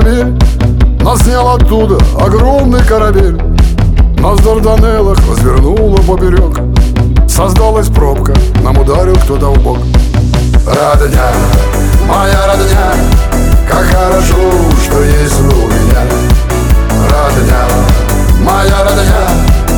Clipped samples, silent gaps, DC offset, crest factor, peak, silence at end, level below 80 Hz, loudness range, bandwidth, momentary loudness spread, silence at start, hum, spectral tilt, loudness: 0.8%; none; under 0.1%; 6 dB; 0 dBFS; 0 s; -8 dBFS; 1 LU; 18.5 kHz; 2 LU; 0 s; none; -6 dB/octave; -9 LUFS